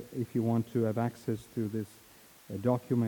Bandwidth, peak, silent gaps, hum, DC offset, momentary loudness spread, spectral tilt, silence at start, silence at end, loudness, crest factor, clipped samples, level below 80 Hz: 19 kHz; -14 dBFS; none; none; under 0.1%; 9 LU; -8.5 dB/octave; 0 s; 0 s; -33 LUFS; 18 dB; under 0.1%; -70 dBFS